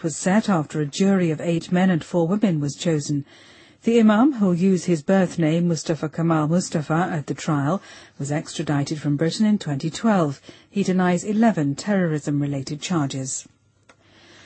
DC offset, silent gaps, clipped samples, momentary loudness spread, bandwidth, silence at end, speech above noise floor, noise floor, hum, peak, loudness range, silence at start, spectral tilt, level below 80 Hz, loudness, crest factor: under 0.1%; none; under 0.1%; 8 LU; 8.8 kHz; 1.05 s; 36 dB; -57 dBFS; none; -6 dBFS; 4 LU; 0 s; -6 dB/octave; -62 dBFS; -22 LUFS; 16 dB